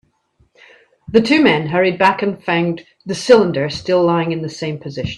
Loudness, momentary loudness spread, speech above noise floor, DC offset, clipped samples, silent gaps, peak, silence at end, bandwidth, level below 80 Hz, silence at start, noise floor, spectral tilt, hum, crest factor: -16 LUFS; 12 LU; 44 dB; under 0.1%; under 0.1%; none; 0 dBFS; 0 s; 11.5 kHz; -50 dBFS; 1.1 s; -59 dBFS; -6 dB/octave; none; 16 dB